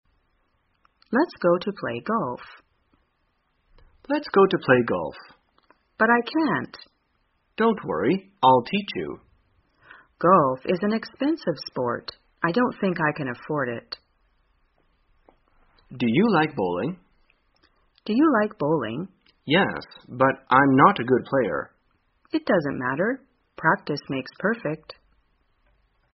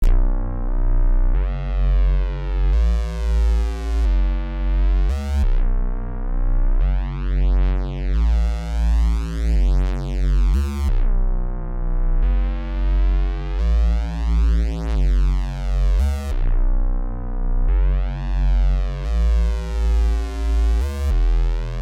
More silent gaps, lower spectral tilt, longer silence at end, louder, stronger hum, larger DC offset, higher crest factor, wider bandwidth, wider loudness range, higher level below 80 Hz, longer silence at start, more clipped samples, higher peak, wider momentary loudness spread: neither; second, -4.5 dB/octave vs -7.5 dB/octave; first, 1.2 s vs 0 s; about the same, -23 LUFS vs -23 LUFS; neither; neither; first, 22 dB vs 10 dB; second, 5.8 kHz vs 7 kHz; first, 6 LU vs 2 LU; second, -62 dBFS vs -18 dBFS; first, 1.1 s vs 0 s; neither; first, -2 dBFS vs -8 dBFS; first, 16 LU vs 5 LU